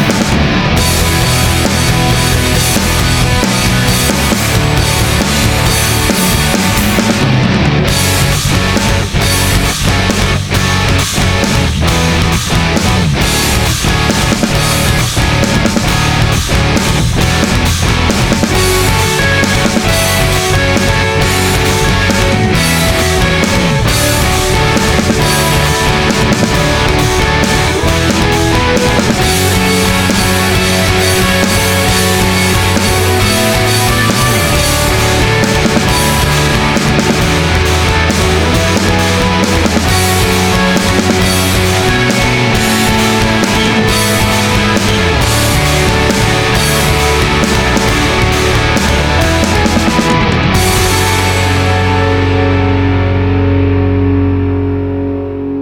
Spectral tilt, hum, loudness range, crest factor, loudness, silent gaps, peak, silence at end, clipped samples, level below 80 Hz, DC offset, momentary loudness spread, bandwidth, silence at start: -4 dB/octave; none; 1 LU; 10 dB; -10 LUFS; none; 0 dBFS; 0 s; under 0.1%; -20 dBFS; under 0.1%; 1 LU; 18 kHz; 0 s